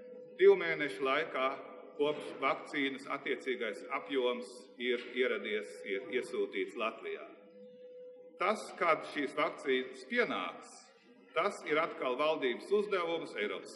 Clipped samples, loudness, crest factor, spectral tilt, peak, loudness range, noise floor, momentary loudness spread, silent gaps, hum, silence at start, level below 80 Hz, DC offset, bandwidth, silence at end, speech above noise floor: under 0.1%; -34 LUFS; 20 dB; -4 dB/octave; -14 dBFS; 3 LU; -61 dBFS; 14 LU; none; none; 0 s; under -90 dBFS; under 0.1%; 11.5 kHz; 0 s; 26 dB